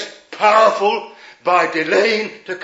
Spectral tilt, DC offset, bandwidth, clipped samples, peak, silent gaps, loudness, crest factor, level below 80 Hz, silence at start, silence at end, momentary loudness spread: -3.5 dB/octave; under 0.1%; 8 kHz; under 0.1%; 0 dBFS; none; -16 LUFS; 16 dB; -78 dBFS; 0 s; 0 s; 13 LU